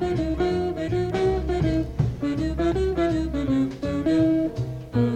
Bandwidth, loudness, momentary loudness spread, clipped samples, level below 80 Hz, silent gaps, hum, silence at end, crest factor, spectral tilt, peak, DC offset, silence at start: 9.2 kHz; -24 LUFS; 5 LU; under 0.1%; -34 dBFS; none; none; 0 s; 14 dB; -8 dB/octave; -8 dBFS; under 0.1%; 0 s